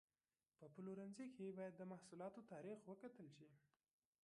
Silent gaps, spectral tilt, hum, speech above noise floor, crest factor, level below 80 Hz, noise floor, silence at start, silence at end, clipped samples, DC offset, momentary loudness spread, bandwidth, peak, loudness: none; -7 dB/octave; none; over 34 dB; 16 dB; under -90 dBFS; under -90 dBFS; 0.6 s; 0.65 s; under 0.1%; under 0.1%; 11 LU; 11 kHz; -42 dBFS; -57 LUFS